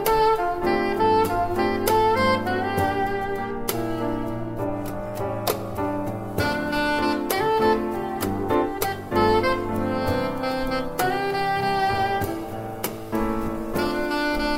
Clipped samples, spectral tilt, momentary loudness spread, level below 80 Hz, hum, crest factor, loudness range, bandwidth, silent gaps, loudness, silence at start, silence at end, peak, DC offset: under 0.1%; -5 dB/octave; 9 LU; -40 dBFS; none; 18 dB; 5 LU; 16 kHz; none; -24 LUFS; 0 s; 0 s; -6 dBFS; under 0.1%